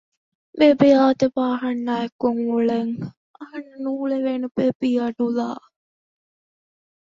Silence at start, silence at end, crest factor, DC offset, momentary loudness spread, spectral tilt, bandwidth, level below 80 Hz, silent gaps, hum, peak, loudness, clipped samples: 0.55 s; 1.45 s; 20 dB; under 0.1%; 20 LU; -7 dB/octave; 7.4 kHz; -64 dBFS; 2.12-2.19 s, 3.17-3.34 s, 4.51-4.55 s, 4.75-4.80 s; none; -2 dBFS; -21 LUFS; under 0.1%